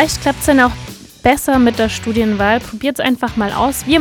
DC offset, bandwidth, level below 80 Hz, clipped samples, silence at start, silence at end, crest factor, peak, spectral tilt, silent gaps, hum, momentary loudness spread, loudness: under 0.1%; 18.5 kHz; -34 dBFS; under 0.1%; 0 s; 0 s; 14 dB; 0 dBFS; -4 dB/octave; none; none; 6 LU; -15 LUFS